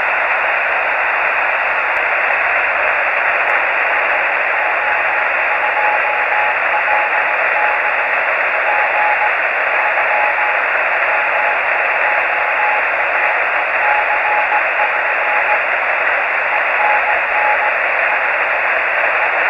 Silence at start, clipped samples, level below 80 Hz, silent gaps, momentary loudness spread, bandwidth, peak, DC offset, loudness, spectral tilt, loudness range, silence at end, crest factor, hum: 0 s; under 0.1%; -56 dBFS; none; 1 LU; 15 kHz; 0 dBFS; under 0.1%; -14 LUFS; -3 dB/octave; 0 LU; 0 s; 16 dB; none